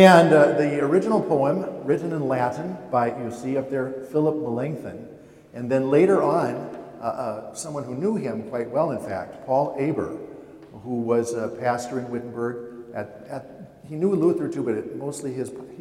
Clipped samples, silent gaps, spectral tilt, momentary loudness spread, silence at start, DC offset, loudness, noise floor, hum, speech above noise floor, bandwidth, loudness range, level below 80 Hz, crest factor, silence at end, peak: under 0.1%; none; -6.5 dB/octave; 18 LU; 0 s; under 0.1%; -24 LUFS; -43 dBFS; none; 20 dB; 17 kHz; 5 LU; -64 dBFS; 22 dB; 0 s; 0 dBFS